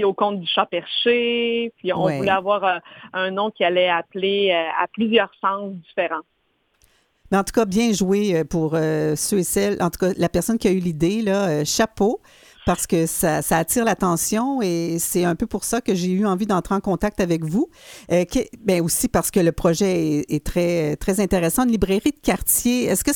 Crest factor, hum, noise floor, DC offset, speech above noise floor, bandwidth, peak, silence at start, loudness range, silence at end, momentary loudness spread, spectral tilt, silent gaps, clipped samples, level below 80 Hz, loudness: 18 dB; none; -64 dBFS; under 0.1%; 44 dB; 19.5 kHz; -2 dBFS; 0 s; 2 LU; 0 s; 5 LU; -4.5 dB/octave; none; under 0.1%; -42 dBFS; -21 LUFS